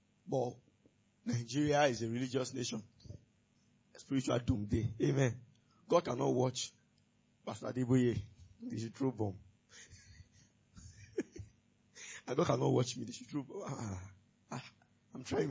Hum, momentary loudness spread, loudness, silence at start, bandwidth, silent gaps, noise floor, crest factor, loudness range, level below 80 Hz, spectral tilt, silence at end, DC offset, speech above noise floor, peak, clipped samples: none; 23 LU; -37 LUFS; 0.25 s; 8 kHz; none; -73 dBFS; 22 dB; 9 LU; -60 dBFS; -6 dB/octave; 0 s; under 0.1%; 37 dB; -16 dBFS; under 0.1%